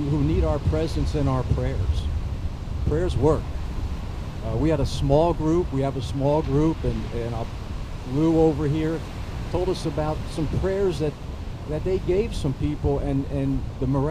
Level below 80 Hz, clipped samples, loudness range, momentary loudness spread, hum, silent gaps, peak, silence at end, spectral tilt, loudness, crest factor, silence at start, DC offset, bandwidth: -32 dBFS; under 0.1%; 3 LU; 11 LU; none; none; -6 dBFS; 0 s; -8 dB/octave; -25 LUFS; 18 dB; 0 s; under 0.1%; 13 kHz